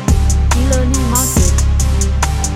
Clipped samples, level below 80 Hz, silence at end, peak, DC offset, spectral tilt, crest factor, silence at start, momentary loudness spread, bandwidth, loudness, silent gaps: under 0.1%; -14 dBFS; 0 s; 0 dBFS; under 0.1%; -4.5 dB/octave; 12 dB; 0 s; 3 LU; 16 kHz; -14 LUFS; none